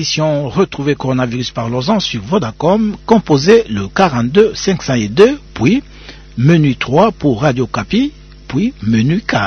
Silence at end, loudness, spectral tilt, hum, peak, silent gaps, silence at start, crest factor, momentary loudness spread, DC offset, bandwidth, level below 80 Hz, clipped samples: 0 s; -14 LUFS; -6 dB/octave; none; 0 dBFS; none; 0 s; 14 dB; 7 LU; under 0.1%; 6.8 kHz; -38 dBFS; 0.2%